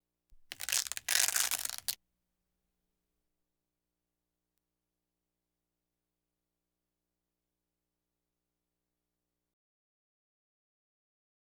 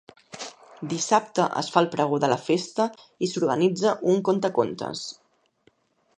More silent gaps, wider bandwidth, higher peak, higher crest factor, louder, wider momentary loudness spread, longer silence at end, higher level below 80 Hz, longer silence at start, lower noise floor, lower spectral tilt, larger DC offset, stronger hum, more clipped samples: neither; first, over 20 kHz vs 10 kHz; second, -8 dBFS vs -2 dBFS; first, 36 dB vs 22 dB; second, -31 LUFS vs -24 LUFS; about the same, 16 LU vs 16 LU; first, 9.6 s vs 1.05 s; about the same, -76 dBFS vs -72 dBFS; about the same, 0.3 s vs 0.35 s; first, -89 dBFS vs -64 dBFS; second, 3 dB/octave vs -5 dB/octave; neither; first, 60 Hz at -95 dBFS vs none; neither